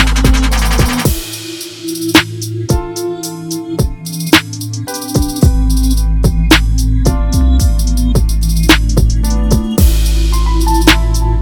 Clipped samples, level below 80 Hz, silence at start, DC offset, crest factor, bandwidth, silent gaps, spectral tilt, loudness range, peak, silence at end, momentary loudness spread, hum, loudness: 0.5%; -14 dBFS; 0 s; under 0.1%; 12 dB; 19.5 kHz; none; -4.5 dB/octave; 4 LU; 0 dBFS; 0 s; 11 LU; none; -13 LUFS